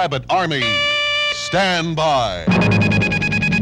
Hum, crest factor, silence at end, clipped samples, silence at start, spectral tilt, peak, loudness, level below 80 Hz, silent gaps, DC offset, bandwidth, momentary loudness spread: none; 12 dB; 0 s; under 0.1%; 0 s; -5 dB/octave; -6 dBFS; -16 LUFS; -40 dBFS; none; under 0.1%; 11.5 kHz; 3 LU